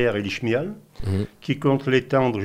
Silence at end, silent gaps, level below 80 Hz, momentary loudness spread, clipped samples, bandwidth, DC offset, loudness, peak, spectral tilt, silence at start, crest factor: 0 s; none; -48 dBFS; 8 LU; under 0.1%; 15 kHz; under 0.1%; -23 LUFS; -6 dBFS; -7 dB/octave; 0 s; 16 dB